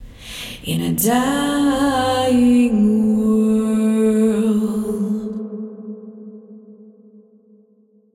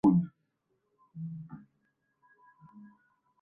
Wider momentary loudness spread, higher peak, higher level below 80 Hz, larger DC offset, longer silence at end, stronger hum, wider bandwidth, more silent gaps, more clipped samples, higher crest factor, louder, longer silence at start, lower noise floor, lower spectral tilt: second, 19 LU vs 27 LU; first, -4 dBFS vs -14 dBFS; first, -46 dBFS vs -68 dBFS; neither; first, 1.3 s vs 0.55 s; neither; first, 16 kHz vs 3.3 kHz; neither; neither; second, 16 dB vs 22 dB; first, -17 LUFS vs -34 LUFS; about the same, 0 s vs 0.05 s; second, -55 dBFS vs -79 dBFS; second, -5.5 dB/octave vs -11.5 dB/octave